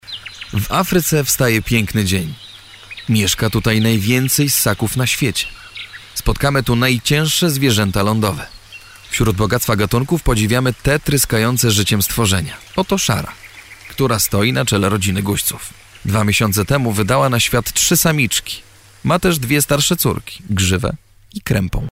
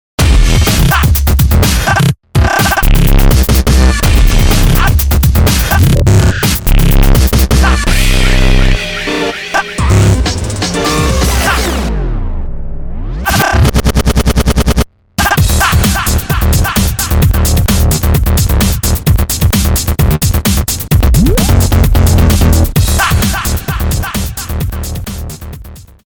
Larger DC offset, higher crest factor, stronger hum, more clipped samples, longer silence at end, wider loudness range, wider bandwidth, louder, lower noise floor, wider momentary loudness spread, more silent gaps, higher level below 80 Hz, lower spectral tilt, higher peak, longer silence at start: neither; first, 14 dB vs 8 dB; neither; second, under 0.1% vs 0.3%; second, 0 s vs 0.25 s; about the same, 2 LU vs 3 LU; second, 16.5 kHz vs over 20 kHz; second, -16 LUFS vs -11 LUFS; first, -39 dBFS vs -30 dBFS; first, 15 LU vs 9 LU; neither; second, -34 dBFS vs -12 dBFS; about the same, -4 dB/octave vs -4.5 dB/octave; about the same, -2 dBFS vs 0 dBFS; second, 0.05 s vs 0.2 s